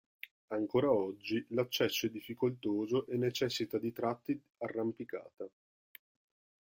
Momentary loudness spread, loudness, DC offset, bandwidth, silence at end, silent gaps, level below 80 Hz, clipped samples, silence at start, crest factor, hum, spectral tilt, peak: 13 LU; -35 LUFS; under 0.1%; 16.5 kHz; 1.15 s; 0.31-0.48 s; -74 dBFS; under 0.1%; 0.25 s; 18 dB; none; -5 dB/octave; -18 dBFS